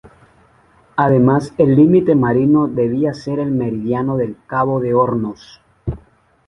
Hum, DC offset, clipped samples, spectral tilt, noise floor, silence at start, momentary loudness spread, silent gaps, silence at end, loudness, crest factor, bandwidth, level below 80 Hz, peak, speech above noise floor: none; under 0.1%; under 0.1%; -9.5 dB/octave; -52 dBFS; 0.05 s; 15 LU; none; 0.5 s; -16 LUFS; 16 dB; 10.5 kHz; -44 dBFS; 0 dBFS; 37 dB